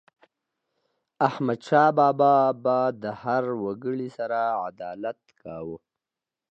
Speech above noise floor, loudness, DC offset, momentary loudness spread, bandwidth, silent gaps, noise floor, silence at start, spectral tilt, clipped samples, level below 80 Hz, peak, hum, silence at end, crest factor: 65 dB; -24 LUFS; under 0.1%; 18 LU; 8 kHz; none; -89 dBFS; 1.2 s; -7.5 dB/octave; under 0.1%; -70 dBFS; -6 dBFS; none; 0.75 s; 20 dB